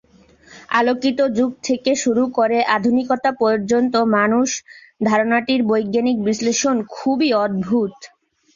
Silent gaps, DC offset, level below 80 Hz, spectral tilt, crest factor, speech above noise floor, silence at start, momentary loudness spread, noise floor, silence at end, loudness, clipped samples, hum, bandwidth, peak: none; under 0.1%; -58 dBFS; -4 dB/octave; 16 dB; 32 dB; 0.5 s; 5 LU; -50 dBFS; 0.5 s; -18 LUFS; under 0.1%; none; 7.6 kHz; -2 dBFS